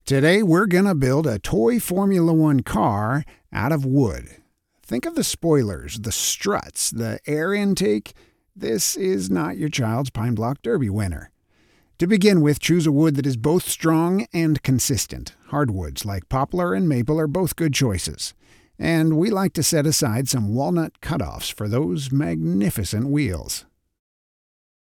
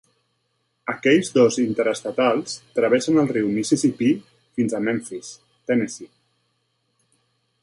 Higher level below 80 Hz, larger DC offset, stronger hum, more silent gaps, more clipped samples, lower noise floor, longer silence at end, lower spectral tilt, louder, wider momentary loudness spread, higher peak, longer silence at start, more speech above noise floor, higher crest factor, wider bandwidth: first, -44 dBFS vs -66 dBFS; neither; neither; neither; neither; second, -60 dBFS vs -71 dBFS; second, 1.4 s vs 1.55 s; about the same, -5 dB/octave vs -5 dB/octave; about the same, -21 LUFS vs -21 LUFS; second, 10 LU vs 15 LU; about the same, -4 dBFS vs -4 dBFS; second, 0.05 s vs 0.85 s; second, 40 dB vs 51 dB; about the same, 18 dB vs 18 dB; first, 18 kHz vs 11.5 kHz